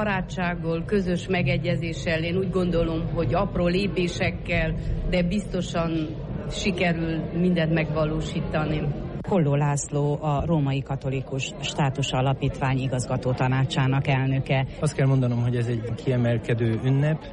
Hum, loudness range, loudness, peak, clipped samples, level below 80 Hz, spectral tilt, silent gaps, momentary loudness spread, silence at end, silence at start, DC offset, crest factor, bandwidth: none; 2 LU; -25 LUFS; -12 dBFS; under 0.1%; -38 dBFS; -6.5 dB/octave; none; 5 LU; 0 s; 0 s; under 0.1%; 12 dB; 11 kHz